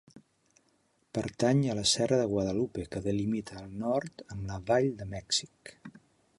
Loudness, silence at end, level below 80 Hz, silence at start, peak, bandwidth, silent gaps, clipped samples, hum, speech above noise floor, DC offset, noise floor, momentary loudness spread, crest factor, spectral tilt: -30 LUFS; 0.4 s; -56 dBFS; 0.15 s; -14 dBFS; 11.5 kHz; none; under 0.1%; none; 41 dB; under 0.1%; -71 dBFS; 15 LU; 18 dB; -4.5 dB/octave